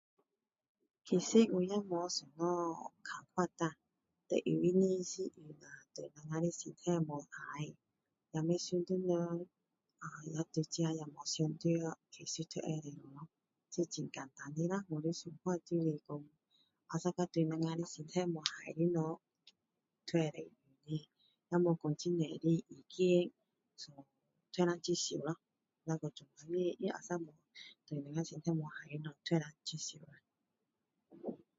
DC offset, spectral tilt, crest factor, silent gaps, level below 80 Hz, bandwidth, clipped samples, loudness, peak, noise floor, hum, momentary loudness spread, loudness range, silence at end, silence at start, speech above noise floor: under 0.1%; -6 dB/octave; 28 dB; none; -82 dBFS; 7.6 kHz; under 0.1%; -38 LUFS; -12 dBFS; -88 dBFS; none; 17 LU; 5 LU; 0.2 s; 1.05 s; 50 dB